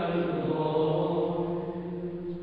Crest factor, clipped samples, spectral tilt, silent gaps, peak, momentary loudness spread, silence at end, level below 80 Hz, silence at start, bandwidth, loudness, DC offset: 14 dB; under 0.1%; -10.5 dB/octave; none; -14 dBFS; 9 LU; 0 s; -58 dBFS; 0 s; 4.9 kHz; -30 LUFS; under 0.1%